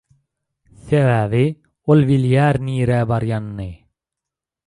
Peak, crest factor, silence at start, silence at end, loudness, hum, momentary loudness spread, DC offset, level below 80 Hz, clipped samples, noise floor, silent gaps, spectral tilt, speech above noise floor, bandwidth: -2 dBFS; 16 dB; 0.85 s; 0.9 s; -17 LUFS; none; 13 LU; under 0.1%; -44 dBFS; under 0.1%; -85 dBFS; none; -8.5 dB/octave; 69 dB; 11 kHz